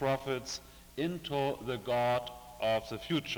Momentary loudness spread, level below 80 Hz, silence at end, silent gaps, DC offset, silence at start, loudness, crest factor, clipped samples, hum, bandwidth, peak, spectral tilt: 10 LU; -60 dBFS; 0 s; none; under 0.1%; 0 s; -34 LUFS; 14 dB; under 0.1%; none; over 20 kHz; -20 dBFS; -5 dB/octave